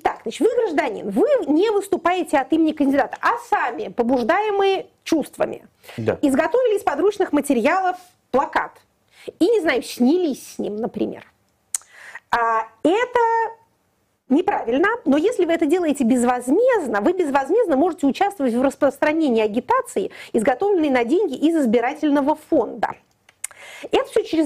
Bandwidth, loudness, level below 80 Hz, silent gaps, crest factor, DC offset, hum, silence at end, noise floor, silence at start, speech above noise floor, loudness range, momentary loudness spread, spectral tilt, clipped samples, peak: 16 kHz; -20 LUFS; -56 dBFS; none; 14 dB; under 0.1%; none; 0 s; -66 dBFS; 0.05 s; 47 dB; 4 LU; 9 LU; -4.5 dB/octave; under 0.1%; -6 dBFS